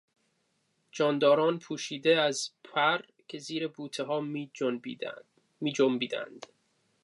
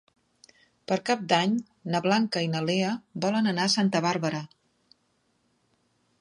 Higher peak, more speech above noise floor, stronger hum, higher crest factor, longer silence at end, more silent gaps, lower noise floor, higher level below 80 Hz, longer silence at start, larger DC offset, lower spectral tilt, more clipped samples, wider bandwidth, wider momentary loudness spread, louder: second, -12 dBFS vs -6 dBFS; about the same, 46 dB vs 45 dB; neither; about the same, 20 dB vs 22 dB; second, 0.6 s vs 1.75 s; neither; first, -75 dBFS vs -71 dBFS; second, -86 dBFS vs -74 dBFS; about the same, 0.95 s vs 0.9 s; neither; about the same, -4 dB/octave vs -5 dB/octave; neither; about the same, 11.5 kHz vs 11.5 kHz; first, 16 LU vs 8 LU; second, -30 LUFS vs -26 LUFS